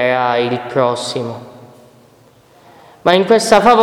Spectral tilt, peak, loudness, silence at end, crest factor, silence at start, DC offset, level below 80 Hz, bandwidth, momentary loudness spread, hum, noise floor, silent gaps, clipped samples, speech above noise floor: -4.5 dB/octave; 0 dBFS; -14 LUFS; 0 s; 16 dB; 0 s; under 0.1%; -52 dBFS; 16.5 kHz; 14 LU; none; -48 dBFS; none; 0.2%; 35 dB